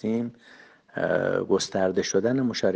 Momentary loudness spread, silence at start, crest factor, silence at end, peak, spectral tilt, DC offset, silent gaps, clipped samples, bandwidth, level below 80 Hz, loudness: 7 LU; 0.05 s; 16 dB; 0 s; -10 dBFS; -4.5 dB/octave; under 0.1%; none; under 0.1%; 9.8 kHz; -64 dBFS; -25 LUFS